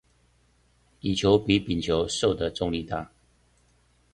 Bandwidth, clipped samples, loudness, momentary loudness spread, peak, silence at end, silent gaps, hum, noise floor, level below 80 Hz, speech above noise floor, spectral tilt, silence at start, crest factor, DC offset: 11 kHz; under 0.1%; -26 LUFS; 12 LU; -6 dBFS; 1.05 s; none; none; -64 dBFS; -48 dBFS; 39 dB; -5 dB/octave; 1.05 s; 22 dB; under 0.1%